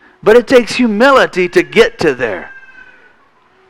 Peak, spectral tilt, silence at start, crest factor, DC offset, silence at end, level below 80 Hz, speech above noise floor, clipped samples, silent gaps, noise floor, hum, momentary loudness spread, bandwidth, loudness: 0 dBFS; -4.5 dB/octave; 0.25 s; 12 dB; under 0.1%; 1.1 s; -42 dBFS; 40 dB; 0.5%; none; -50 dBFS; none; 9 LU; 15.5 kHz; -10 LUFS